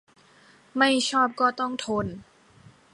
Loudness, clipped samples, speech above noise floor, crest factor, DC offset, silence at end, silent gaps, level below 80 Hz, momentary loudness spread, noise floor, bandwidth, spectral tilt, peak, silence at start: -24 LUFS; under 0.1%; 32 dB; 20 dB; under 0.1%; 0.7 s; none; -60 dBFS; 14 LU; -56 dBFS; 11.5 kHz; -3.5 dB/octave; -6 dBFS; 0.75 s